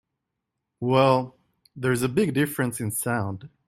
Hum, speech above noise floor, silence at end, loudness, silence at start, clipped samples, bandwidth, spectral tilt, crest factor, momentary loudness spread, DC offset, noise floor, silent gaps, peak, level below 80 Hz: none; 58 dB; 0.2 s; -24 LUFS; 0.8 s; under 0.1%; 16.5 kHz; -5.5 dB/octave; 20 dB; 11 LU; under 0.1%; -82 dBFS; none; -6 dBFS; -60 dBFS